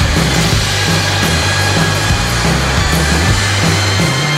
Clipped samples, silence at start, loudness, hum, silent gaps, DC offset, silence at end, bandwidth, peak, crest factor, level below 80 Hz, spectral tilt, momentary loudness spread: under 0.1%; 0 s; -12 LUFS; none; none; under 0.1%; 0 s; 16 kHz; 0 dBFS; 12 dB; -22 dBFS; -3.5 dB/octave; 1 LU